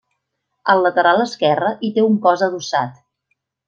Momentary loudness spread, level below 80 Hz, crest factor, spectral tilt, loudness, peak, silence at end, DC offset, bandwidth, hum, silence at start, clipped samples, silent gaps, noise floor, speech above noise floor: 7 LU; -68 dBFS; 16 dB; -5 dB/octave; -17 LUFS; -2 dBFS; 0.75 s; under 0.1%; 7.8 kHz; none; 0.65 s; under 0.1%; none; -74 dBFS; 58 dB